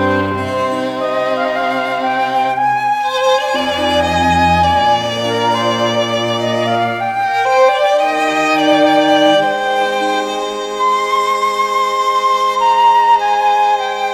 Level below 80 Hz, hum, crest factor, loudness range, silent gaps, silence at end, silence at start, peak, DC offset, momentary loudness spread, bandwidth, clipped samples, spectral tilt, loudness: -48 dBFS; none; 12 dB; 2 LU; none; 0 s; 0 s; 0 dBFS; under 0.1%; 6 LU; 16.5 kHz; under 0.1%; -4 dB/octave; -14 LUFS